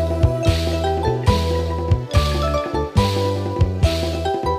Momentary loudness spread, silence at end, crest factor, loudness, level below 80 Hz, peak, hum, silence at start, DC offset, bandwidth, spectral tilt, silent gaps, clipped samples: 3 LU; 0 s; 16 dB; -20 LUFS; -26 dBFS; -2 dBFS; none; 0 s; under 0.1%; 15 kHz; -6.5 dB/octave; none; under 0.1%